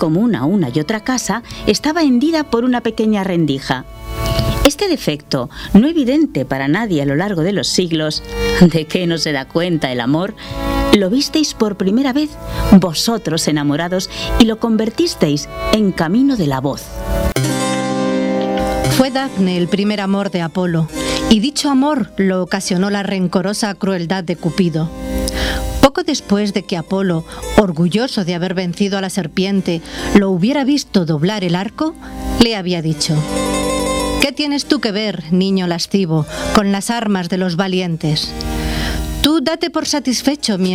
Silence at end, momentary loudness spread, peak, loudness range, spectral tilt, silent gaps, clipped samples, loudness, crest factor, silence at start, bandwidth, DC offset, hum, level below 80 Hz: 0 s; 7 LU; 0 dBFS; 2 LU; -5 dB/octave; none; under 0.1%; -16 LUFS; 16 dB; 0 s; over 20 kHz; under 0.1%; none; -30 dBFS